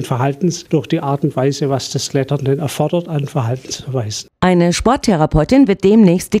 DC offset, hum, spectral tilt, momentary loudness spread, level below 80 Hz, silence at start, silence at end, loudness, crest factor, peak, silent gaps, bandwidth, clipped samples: under 0.1%; none; -6 dB/octave; 10 LU; -36 dBFS; 0 s; 0 s; -15 LUFS; 14 dB; 0 dBFS; none; 15.5 kHz; under 0.1%